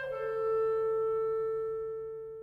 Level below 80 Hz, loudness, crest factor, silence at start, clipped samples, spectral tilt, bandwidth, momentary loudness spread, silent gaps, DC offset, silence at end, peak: -66 dBFS; -33 LUFS; 8 dB; 0 s; under 0.1%; -6.5 dB/octave; 4.7 kHz; 9 LU; none; under 0.1%; 0 s; -24 dBFS